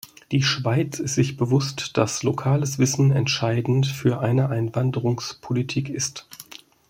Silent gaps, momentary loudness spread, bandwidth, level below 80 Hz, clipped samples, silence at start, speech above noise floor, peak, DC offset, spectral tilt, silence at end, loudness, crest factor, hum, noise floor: none; 7 LU; 16 kHz; -58 dBFS; under 0.1%; 0.3 s; 23 dB; -2 dBFS; under 0.1%; -5 dB/octave; 0.45 s; -23 LUFS; 20 dB; none; -45 dBFS